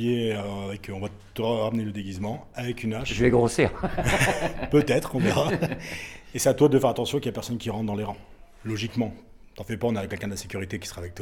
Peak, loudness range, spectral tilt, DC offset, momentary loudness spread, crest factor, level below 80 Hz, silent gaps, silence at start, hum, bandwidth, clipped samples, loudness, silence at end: -6 dBFS; 7 LU; -5.5 dB/octave; under 0.1%; 14 LU; 20 dB; -44 dBFS; none; 0 s; none; 18 kHz; under 0.1%; -26 LUFS; 0 s